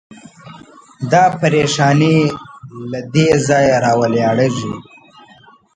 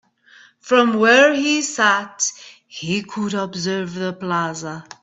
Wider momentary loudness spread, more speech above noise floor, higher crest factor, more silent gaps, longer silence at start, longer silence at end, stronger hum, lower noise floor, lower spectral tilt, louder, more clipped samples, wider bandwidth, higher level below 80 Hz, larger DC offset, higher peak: about the same, 15 LU vs 13 LU; about the same, 33 dB vs 31 dB; about the same, 16 dB vs 20 dB; neither; second, 0.1 s vs 0.65 s; first, 0.95 s vs 0.2 s; neither; second, -46 dBFS vs -50 dBFS; first, -5.5 dB/octave vs -3.5 dB/octave; first, -14 LUFS vs -18 LUFS; neither; first, 9.4 kHz vs 8.4 kHz; first, -50 dBFS vs -64 dBFS; neither; about the same, 0 dBFS vs 0 dBFS